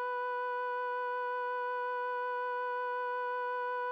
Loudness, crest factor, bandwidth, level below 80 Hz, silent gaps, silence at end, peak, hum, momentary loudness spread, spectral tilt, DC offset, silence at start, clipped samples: -35 LUFS; 6 dB; 5.8 kHz; under -90 dBFS; none; 0 s; -28 dBFS; none; 0 LU; -1 dB/octave; under 0.1%; 0 s; under 0.1%